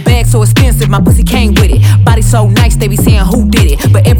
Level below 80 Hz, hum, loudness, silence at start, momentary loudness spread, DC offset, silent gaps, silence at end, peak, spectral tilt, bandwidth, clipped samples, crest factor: -12 dBFS; none; -8 LUFS; 0 s; 2 LU; under 0.1%; none; 0 s; 0 dBFS; -6 dB/octave; 18.5 kHz; under 0.1%; 6 dB